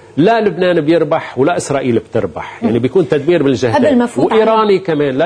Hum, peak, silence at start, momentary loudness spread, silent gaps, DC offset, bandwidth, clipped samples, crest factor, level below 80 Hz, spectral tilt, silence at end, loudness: none; 0 dBFS; 0.15 s; 5 LU; none; under 0.1%; 10.5 kHz; under 0.1%; 12 dB; -48 dBFS; -6.5 dB/octave; 0 s; -13 LUFS